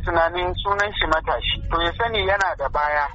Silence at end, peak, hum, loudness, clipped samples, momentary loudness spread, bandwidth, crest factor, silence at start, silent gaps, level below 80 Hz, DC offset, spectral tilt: 0 s; -6 dBFS; none; -21 LUFS; under 0.1%; 3 LU; 8 kHz; 16 dB; 0 s; none; -32 dBFS; under 0.1%; -1.5 dB/octave